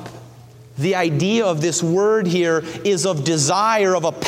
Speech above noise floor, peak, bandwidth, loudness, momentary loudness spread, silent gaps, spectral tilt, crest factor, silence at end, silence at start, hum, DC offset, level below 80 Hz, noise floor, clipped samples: 25 dB; -4 dBFS; 16 kHz; -18 LUFS; 5 LU; none; -4.5 dB/octave; 14 dB; 0 s; 0 s; none; under 0.1%; -60 dBFS; -42 dBFS; under 0.1%